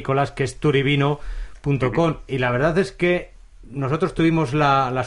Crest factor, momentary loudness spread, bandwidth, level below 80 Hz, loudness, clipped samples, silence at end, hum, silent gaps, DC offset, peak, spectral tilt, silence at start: 14 dB; 9 LU; 11.5 kHz; -40 dBFS; -21 LUFS; under 0.1%; 0 s; none; none; under 0.1%; -6 dBFS; -7 dB/octave; 0 s